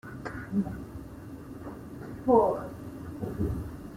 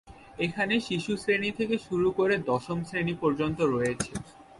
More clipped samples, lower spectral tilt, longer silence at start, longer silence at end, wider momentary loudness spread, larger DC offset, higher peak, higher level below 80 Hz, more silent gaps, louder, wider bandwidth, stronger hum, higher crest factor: neither; first, -9 dB/octave vs -5.5 dB/octave; about the same, 0.05 s vs 0.05 s; about the same, 0 s vs 0 s; first, 20 LU vs 7 LU; neither; first, -8 dBFS vs -12 dBFS; first, -48 dBFS vs -56 dBFS; neither; about the same, -30 LUFS vs -28 LUFS; first, 16 kHz vs 11.5 kHz; neither; first, 24 dB vs 16 dB